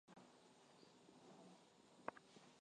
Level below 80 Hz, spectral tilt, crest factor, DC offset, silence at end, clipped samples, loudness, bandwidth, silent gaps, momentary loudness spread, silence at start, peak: under -90 dBFS; -4 dB/octave; 36 dB; under 0.1%; 0 s; under 0.1%; -63 LUFS; 10 kHz; none; 13 LU; 0.05 s; -28 dBFS